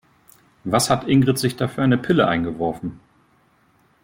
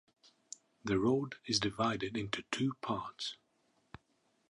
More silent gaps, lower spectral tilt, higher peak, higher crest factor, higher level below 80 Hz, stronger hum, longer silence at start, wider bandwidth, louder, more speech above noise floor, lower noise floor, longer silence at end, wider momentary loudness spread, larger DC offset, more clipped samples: neither; about the same, -5.5 dB/octave vs -4.5 dB/octave; first, -4 dBFS vs -16 dBFS; about the same, 18 dB vs 22 dB; first, -52 dBFS vs -66 dBFS; neither; second, 0.65 s vs 0.85 s; first, 16.5 kHz vs 11 kHz; first, -20 LUFS vs -36 LUFS; about the same, 40 dB vs 41 dB; second, -59 dBFS vs -76 dBFS; about the same, 1.05 s vs 1.15 s; second, 12 LU vs 19 LU; neither; neither